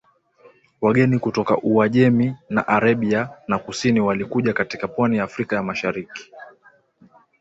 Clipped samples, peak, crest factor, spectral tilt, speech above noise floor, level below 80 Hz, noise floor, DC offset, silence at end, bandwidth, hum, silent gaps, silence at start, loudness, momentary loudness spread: under 0.1%; -4 dBFS; 16 dB; -7 dB/octave; 35 dB; -56 dBFS; -55 dBFS; under 0.1%; 0.9 s; 8 kHz; none; none; 0.8 s; -20 LUFS; 8 LU